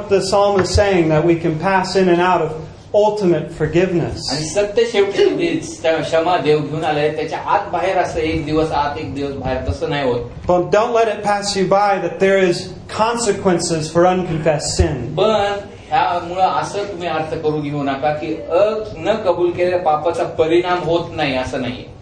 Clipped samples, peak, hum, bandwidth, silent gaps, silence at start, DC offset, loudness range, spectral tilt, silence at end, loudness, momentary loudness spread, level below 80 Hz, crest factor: under 0.1%; 0 dBFS; none; 10.5 kHz; none; 0 s; under 0.1%; 3 LU; -5 dB/octave; 0 s; -17 LUFS; 7 LU; -36 dBFS; 16 dB